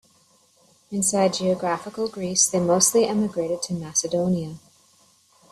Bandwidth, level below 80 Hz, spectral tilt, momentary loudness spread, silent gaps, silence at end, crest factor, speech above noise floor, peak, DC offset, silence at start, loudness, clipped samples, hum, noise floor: 15 kHz; -64 dBFS; -3.5 dB/octave; 10 LU; none; 0.95 s; 20 dB; 37 dB; -4 dBFS; under 0.1%; 0.9 s; -22 LUFS; under 0.1%; none; -60 dBFS